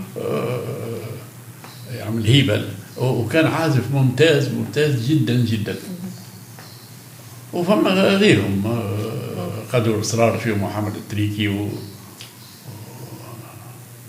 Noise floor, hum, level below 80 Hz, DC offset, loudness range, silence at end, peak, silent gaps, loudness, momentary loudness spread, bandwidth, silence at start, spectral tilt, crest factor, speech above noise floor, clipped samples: -40 dBFS; none; -66 dBFS; under 0.1%; 5 LU; 0 s; 0 dBFS; none; -20 LUFS; 23 LU; 16 kHz; 0 s; -6 dB/octave; 20 dB; 22 dB; under 0.1%